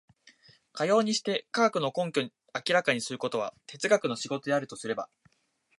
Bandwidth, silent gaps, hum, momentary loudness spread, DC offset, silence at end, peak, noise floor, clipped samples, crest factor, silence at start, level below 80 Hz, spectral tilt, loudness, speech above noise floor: 11.5 kHz; none; none; 10 LU; under 0.1%; 0.75 s; -10 dBFS; -72 dBFS; under 0.1%; 20 dB; 0.75 s; -80 dBFS; -3.5 dB/octave; -29 LUFS; 43 dB